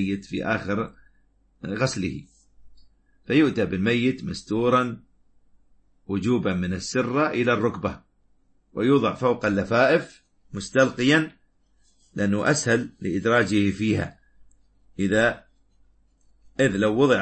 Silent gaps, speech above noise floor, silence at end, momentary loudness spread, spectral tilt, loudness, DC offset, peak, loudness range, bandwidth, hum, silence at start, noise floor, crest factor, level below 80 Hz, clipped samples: none; 39 dB; 0 s; 15 LU; -5.5 dB/octave; -23 LUFS; under 0.1%; -4 dBFS; 4 LU; 8.8 kHz; none; 0 s; -62 dBFS; 20 dB; -54 dBFS; under 0.1%